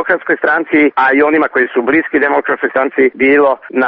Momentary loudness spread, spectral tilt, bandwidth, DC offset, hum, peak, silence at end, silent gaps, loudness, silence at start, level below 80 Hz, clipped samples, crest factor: 4 LU; -2.5 dB/octave; 5 kHz; under 0.1%; none; 0 dBFS; 0 s; none; -12 LUFS; 0 s; -56 dBFS; under 0.1%; 12 dB